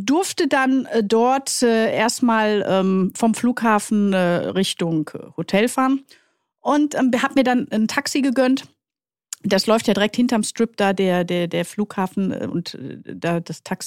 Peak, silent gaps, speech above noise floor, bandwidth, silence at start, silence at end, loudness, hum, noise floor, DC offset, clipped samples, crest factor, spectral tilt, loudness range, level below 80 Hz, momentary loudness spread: -4 dBFS; none; over 71 dB; 16.5 kHz; 0 s; 0 s; -20 LUFS; none; under -90 dBFS; under 0.1%; under 0.1%; 16 dB; -4.5 dB/octave; 3 LU; -64 dBFS; 8 LU